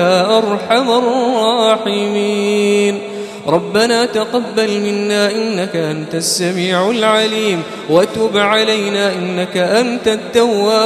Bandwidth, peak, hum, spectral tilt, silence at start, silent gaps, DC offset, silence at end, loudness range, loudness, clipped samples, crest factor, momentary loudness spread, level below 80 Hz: 14 kHz; 0 dBFS; none; -4 dB/octave; 0 s; none; under 0.1%; 0 s; 2 LU; -14 LUFS; under 0.1%; 14 dB; 6 LU; -56 dBFS